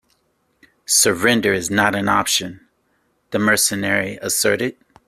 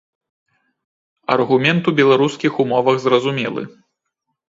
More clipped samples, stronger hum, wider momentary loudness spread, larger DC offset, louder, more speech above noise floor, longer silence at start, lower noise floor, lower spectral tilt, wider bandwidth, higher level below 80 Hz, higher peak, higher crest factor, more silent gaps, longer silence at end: neither; neither; second, 9 LU vs 12 LU; neither; about the same, -17 LUFS vs -16 LUFS; second, 47 dB vs 60 dB; second, 0.9 s vs 1.3 s; second, -65 dBFS vs -76 dBFS; second, -2.5 dB/octave vs -6 dB/octave; first, 16 kHz vs 7.8 kHz; first, -56 dBFS vs -64 dBFS; about the same, 0 dBFS vs 0 dBFS; about the same, 20 dB vs 18 dB; neither; second, 0.35 s vs 0.8 s